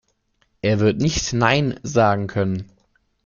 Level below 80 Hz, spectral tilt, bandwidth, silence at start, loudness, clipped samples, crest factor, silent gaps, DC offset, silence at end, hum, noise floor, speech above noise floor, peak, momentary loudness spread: -44 dBFS; -5 dB/octave; 7.4 kHz; 0.65 s; -20 LUFS; under 0.1%; 18 dB; none; under 0.1%; 0.6 s; none; -66 dBFS; 47 dB; -2 dBFS; 7 LU